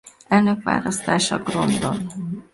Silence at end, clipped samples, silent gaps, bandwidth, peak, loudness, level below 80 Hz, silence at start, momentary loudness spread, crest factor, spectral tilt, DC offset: 0.1 s; under 0.1%; none; 11.5 kHz; -4 dBFS; -21 LUFS; -52 dBFS; 0.05 s; 9 LU; 18 dB; -4.5 dB/octave; under 0.1%